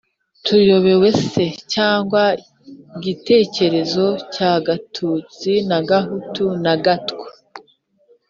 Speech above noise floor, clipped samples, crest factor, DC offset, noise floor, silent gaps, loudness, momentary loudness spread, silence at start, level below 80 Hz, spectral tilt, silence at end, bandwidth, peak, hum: 40 dB; under 0.1%; 16 dB; under 0.1%; -57 dBFS; none; -17 LUFS; 13 LU; 0.45 s; -58 dBFS; -6 dB/octave; 0.7 s; 7.6 kHz; -2 dBFS; none